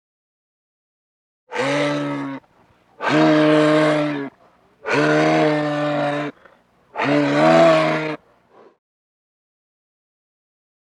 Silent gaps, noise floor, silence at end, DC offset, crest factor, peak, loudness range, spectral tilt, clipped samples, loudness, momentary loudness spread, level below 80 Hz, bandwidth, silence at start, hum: none; -56 dBFS; 2.65 s; under 0.1%; 18 dB; -4 dBFS; 4 LU; -6 dB/octave; under 0.1%; -18 LUFS; 17 LU; -72 dBFS; 10.5 kHz; 1.5 s; none